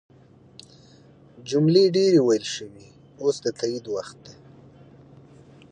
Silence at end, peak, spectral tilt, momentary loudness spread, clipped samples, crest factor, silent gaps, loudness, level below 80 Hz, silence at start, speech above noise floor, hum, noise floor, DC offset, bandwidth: 1.4 s; -6 dBFS; -6 dB/octave; 18 LU; under 0.1%; 18 dB; none; -22 LUFS; -66 dBFS; 1.4 s; 30 dB; none; -52 dBFS; under 0.1%; 9.8 kHz